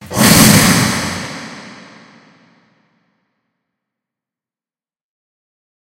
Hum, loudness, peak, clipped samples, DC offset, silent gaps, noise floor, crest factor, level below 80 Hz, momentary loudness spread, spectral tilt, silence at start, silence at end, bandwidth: none; -10 LUFS; 0 dBFS; 0.2%; under 0.1%; none; under -90 dBFS; 18 dB; -40 dBFS; 23 LU; -3.5 dB/octave; 0 s; 4.2 s; over 20 kHz